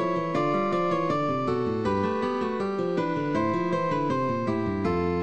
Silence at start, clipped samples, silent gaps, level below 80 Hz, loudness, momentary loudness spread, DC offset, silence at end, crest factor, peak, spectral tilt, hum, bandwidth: 0 s; under 0.1%; none; -54 dBFS; -26 LUFS; 2 LU; 0.4%; 0 s; 14 dB; -14 dBFS; -7.5 dB/octave; none; 8.8 kHz